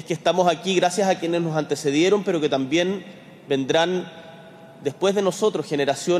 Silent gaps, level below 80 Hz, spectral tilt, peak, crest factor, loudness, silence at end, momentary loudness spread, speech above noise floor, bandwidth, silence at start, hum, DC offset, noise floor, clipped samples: none; -68 dBFS; -4.5 dB/octave; -6 dBFS; 16 dB; -22 LUFS; 0 s; 11 LU; 22 dB; 14.5 kHz; 0 s; none; under 0.1%; -44 dBFS; under 0.1%